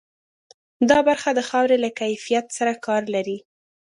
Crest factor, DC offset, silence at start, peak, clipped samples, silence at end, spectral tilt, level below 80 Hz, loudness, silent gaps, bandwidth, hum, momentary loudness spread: 20 dB; under 0.1%; 0.8 s; -2 dBFS; under 0.1%; 0.55 s; -3.5 dB/octave; -62 dBFS; -21 LUFS; none; 11.5 kHz; none; 9 LU